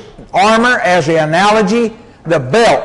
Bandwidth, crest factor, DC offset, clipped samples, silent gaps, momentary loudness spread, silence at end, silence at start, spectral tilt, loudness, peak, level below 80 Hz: 11.5 kHz; 10 dB; under 0.1%; under 0.1%; none; 8 LU; 0 s; 0.05 s; -4.5 dB/octave; -11 LUFS; -2 dBFS; -44 dBFS